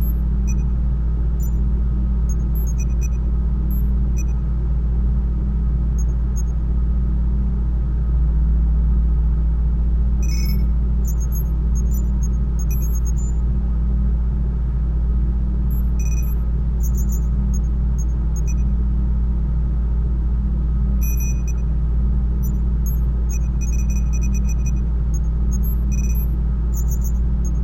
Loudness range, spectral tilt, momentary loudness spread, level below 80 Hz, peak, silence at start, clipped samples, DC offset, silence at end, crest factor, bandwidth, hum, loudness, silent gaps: 1 LU; -7.5 dB/octave; 2 LU; -18 dBFS; -8 dBFS; 0 s; under 0.1%; under 0.1%; 0 s; 8 dB; 15 kHz; none; -21 LUFS; none